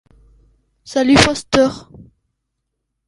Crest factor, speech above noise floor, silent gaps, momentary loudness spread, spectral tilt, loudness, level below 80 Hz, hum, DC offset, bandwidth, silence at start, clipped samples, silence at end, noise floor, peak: 18 dB; 61 dB; none; 11 LU; -4 dB/octave; -14 LUFS; -40 dBFS; none; under 0.1%; 11.5 kHz; 0.9 s; under 0.1%; 1.3 s; -75 dBFS; 0 dBFS